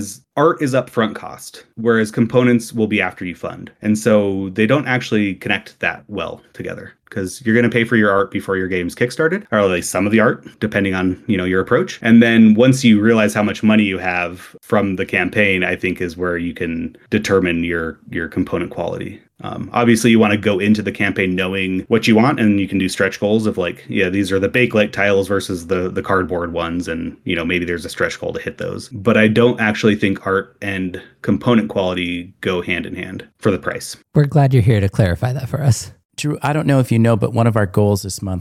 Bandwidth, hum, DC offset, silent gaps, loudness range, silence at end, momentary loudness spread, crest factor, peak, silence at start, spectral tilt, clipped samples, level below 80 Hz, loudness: 14 kHz; none; under 0.1%; 36.05-36.09 s; 6 LU; 0 s; 12 LU; 16 dB; -2 dBFS; 0 s; -6 dB/octave; under 0.1%; -48 dBFS; -17 LUFS